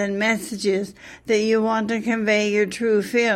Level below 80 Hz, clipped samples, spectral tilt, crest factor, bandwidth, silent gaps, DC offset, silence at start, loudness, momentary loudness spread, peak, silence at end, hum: -60 dBFS; under 0.1%; -4.5 dB/octave; 14 dB; 14.5 kHz; none; under 0.1%; 0 s; -21 LUFS; 5 LU; -6 dBFS; 0 s; none